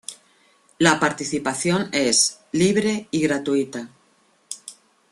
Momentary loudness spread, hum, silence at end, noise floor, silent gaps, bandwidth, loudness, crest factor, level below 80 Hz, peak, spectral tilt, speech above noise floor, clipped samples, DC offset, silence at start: 18 LU; none; 0.4 s; -61 dBFS; none; 12.5 kHz; -20 LUFS; 22 dB; -60 dBFS; 0 dBFS; -3.5 dB/octave; 40 dB; under 0.1%; under 0.1%; 0.1 s